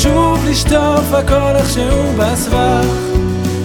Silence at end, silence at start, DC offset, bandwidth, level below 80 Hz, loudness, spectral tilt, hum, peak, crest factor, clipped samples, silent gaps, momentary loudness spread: 0 s; 0 s; under 0.1%; 19 kHz; -20 dBFS; -13 LUFS; -5.5 dB/octave; none; 0 dBFS; 12 dB; under 0.1%; none; 4 LU